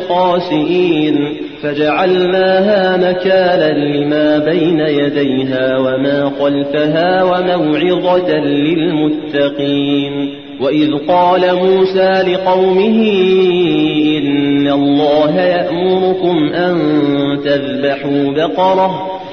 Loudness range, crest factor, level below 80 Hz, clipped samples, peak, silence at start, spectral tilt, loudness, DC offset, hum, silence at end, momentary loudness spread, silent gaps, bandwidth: 2 LU; 10 dB; -52 dBFS; under 0.1%; -2 dBFS; 0 s; -8 dB/octave; -13 LUFS; 0.3%; none; 0 s; 4 LU; none; 6.4 kHz